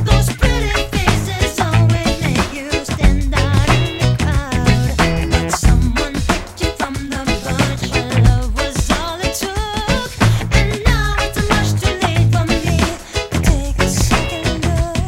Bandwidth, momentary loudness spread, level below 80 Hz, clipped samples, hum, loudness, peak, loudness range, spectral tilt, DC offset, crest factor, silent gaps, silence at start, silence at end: 16.5 kHz; 6 LU; -20 dBFS; under 0.1%; none; -16 LUFS; 0 dBFS; 2 LU; -5 dB/octave; under 0.1%; 16 dB; none; 0 s; 0 s